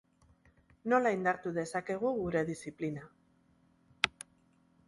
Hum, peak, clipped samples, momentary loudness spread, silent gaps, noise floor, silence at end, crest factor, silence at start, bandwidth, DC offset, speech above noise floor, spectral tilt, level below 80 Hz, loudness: none; -8 dBFS; under 0.1%; 14 LU; none; -69 dBFS; 0.8 s; 28 dB; 0.85 s; 11.5 kHz; under 0.1%; 36 dB; -5 dB/octave; -66 dBFS; -34 LUFS